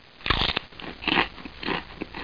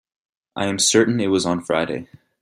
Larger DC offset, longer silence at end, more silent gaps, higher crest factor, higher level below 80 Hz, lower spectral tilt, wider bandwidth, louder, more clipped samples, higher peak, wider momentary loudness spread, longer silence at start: first, 0.3% vs under 0.1%; second, 0 s vs 0.35 s; neither; first, 24 dB vs 18 dB; first, -42 dBFS vs -60 dBFS; first, -5.5 dB/octave vs -3.5 dB/octave; second, 5.4 kHz vs 15.5 kHz; second, -26 LUFS vs -19 LUFS; neither; about the same, -4 dBFS vs -2 dBFS; about the same, 12 LU vs 13 LU; second, 0 s vs 0.55 s